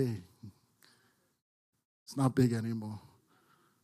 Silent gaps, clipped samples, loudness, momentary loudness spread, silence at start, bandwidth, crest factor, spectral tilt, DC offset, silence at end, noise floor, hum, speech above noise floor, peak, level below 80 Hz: 1.42-1.73 s, 1.85-2.06 s; under 0.1%; -33 LUFS; 26 LU; 0 s; 14.5 kHz; 22 dB; -7.5 dB/octave; under 0.1%; 0.85 s; -71 dBFS; none; 40 dB; -16 dBFS; -72 dBFS